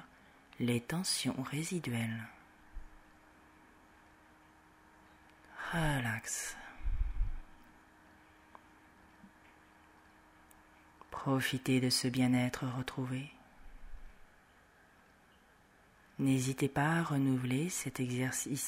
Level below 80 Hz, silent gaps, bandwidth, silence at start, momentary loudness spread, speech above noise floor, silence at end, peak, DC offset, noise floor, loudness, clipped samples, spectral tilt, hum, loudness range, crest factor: -48 dBFS; none; 16 kHz; 0 s; 21 LU; 31 dB; 0 s; -18 dBFS; under 0.1%; -65 dBFS; -35 LUFS; under 0.1%; -4.5 dB/octave; none; 13 LU; 20 dB